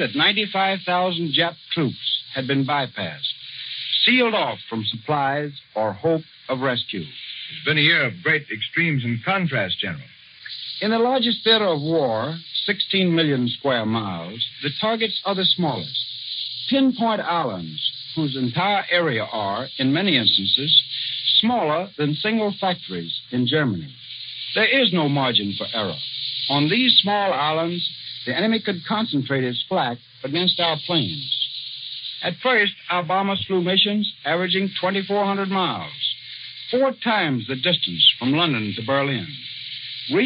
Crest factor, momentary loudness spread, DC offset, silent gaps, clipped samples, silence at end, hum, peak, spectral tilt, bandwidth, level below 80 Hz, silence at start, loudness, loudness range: 20 dB; 11 LU; under 0.1%; none; under 0.1%; 0 s; none; -2 dBFS; -2 dB/octave; 5.4 kHz; -70 dBFS; 0 s; -21 LUFS; 4 LU